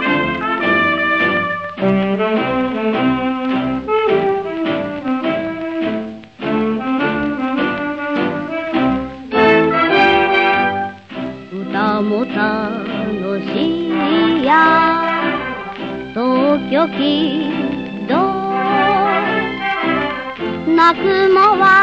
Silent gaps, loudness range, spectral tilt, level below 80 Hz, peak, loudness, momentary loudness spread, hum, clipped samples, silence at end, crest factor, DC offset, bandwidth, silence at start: none; 5 LU; -7 dB/octave; -46 dBFS; 0 dBFS; -16 LUFS; 10 LU; none; under 0.1%; 0 s; 16 dB; 0.2%; 7.8 kHz; 0 s